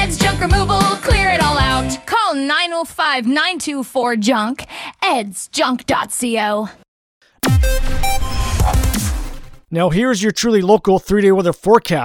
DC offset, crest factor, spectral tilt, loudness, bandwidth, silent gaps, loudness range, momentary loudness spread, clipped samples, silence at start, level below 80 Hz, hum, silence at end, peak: under 0.1%; 16 dB; -4.5 dB/octave; -16 LUFS; 19 kHz; 6.88-7.21 s; 4 LU; 8 LU; under 0.1%; 0 s; -24 dBFS; none; 0 s; 0 dBFS